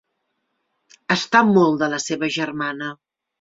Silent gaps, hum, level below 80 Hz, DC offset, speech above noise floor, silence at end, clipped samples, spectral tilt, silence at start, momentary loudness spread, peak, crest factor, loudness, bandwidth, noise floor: none; none; -64 dBFS; under 0.1%; 55 dB; 0.45 s; under 0.1%; -4.5 dB/octave; 1.1 s; 15 LU; -2 dBFS; 20 dB; -19 LUFS; 7.8 kHz; -74 dBFS